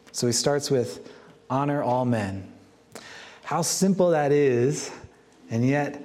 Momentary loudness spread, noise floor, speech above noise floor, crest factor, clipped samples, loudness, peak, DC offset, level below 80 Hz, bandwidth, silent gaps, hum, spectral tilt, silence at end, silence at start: 21 LU; -49 dBFS; 26 dB; 16 dB; under 0.1%; -24 LUFS; -8 dBFS; under 0.1%; -66 dBFS; 16 kHz; none; none; -5 dB/octave; 0 s; 0.15 s